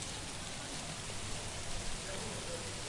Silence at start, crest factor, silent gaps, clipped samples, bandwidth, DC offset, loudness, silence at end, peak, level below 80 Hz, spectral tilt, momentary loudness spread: 0 s; 16 dB; none; under 0.1%; 11.5 kHz; under 0.1%; -41 LUFS; 0 s; -26 dBFS; -50 dBFS; -2.5 dB/octave; 1 LU